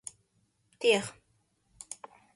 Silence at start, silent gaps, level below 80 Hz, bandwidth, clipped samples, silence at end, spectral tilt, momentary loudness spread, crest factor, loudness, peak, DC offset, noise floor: 0.8 s; none; -74 dBFS; 11.5 kHz; under 0.1%; 0.4 s; -2.5 dB/octave; 20 LU; 24 dB; -28 LUFS; -12 dBFS; under 0.1%; -73 dBFS